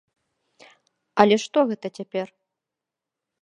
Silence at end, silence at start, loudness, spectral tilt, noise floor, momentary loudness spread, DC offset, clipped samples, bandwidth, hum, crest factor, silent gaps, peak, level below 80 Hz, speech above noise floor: 1.15 s; 1.15 s; -22 LUFS; -5 dB/octave; -87 dBFS; 13 LU; under 0.1%; under 0.1%; 10.5 kHz; none; 26 dB; none; 0 dBFS; -70 dBFS; 65 dB